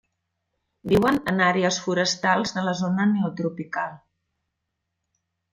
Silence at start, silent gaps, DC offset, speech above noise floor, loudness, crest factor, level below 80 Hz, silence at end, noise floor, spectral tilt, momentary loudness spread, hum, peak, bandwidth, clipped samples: 0.85 s; none; under 0.1%; 57 dB; -23 LUFS; 20 dB; -56 dBFS; 1.55 s; -80 dBFS; -5 dB/octave; 10 LU; none; -6 dBFS; 15.5 kHz; under 0.1%